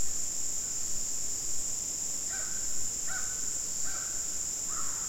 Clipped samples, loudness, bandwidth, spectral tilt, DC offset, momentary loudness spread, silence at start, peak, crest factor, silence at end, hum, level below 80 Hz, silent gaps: under 0.1%; -31 LUFS; 16.5 kHz; 0 dB/octave; 0.7%; 0 LU; 0 s; -18 dBFS; 14 dB; 0 s; none; -54 dBFS; none